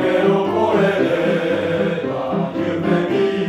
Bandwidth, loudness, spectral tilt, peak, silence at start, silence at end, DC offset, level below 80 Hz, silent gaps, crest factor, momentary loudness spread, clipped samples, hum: 12 kHz; -18 LUFS; -7.5 dB/octave; -4 dBFS; 0 s; 0 s; under 0.1%; -54 dBFS; none; 12 dB; 5 LU; under 0.1%; none